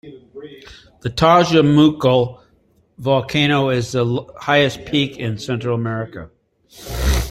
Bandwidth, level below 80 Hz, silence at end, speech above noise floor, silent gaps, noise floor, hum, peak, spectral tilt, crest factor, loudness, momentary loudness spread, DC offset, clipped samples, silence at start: 16 kHz; -32 dBFS; 0 s; 40 dB; none; -57 dBFS; none; 0 dBFS; -6 dB/octave; 18 dB; -17 LUFS; 19 LU; under 0.1%; under 0.1%; 0.05 s